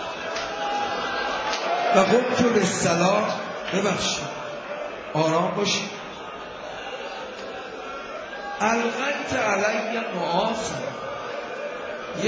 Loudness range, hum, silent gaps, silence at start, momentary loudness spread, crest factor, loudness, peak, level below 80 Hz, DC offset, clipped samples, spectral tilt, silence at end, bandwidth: 7 LU; none; none; 0 s; 14 LU; 20 dB; -25 LUFS; -6 dBFS; -56 dBFS; under 0.1%; under 0.1%; -4 dB/octave; 0 s; 8 kHz